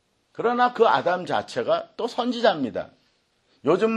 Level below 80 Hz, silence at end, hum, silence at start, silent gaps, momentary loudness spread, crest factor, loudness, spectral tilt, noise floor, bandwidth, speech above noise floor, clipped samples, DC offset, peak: -70 dBFS; 0 s; none; 0.4 s; none; 10 LU; 18 dB; -23 LUFS; -5.5 dB/octave; -66 dBFS; 10.5 kHz; 44 dB; under 0.1%; under 0.1%; -6 dBFS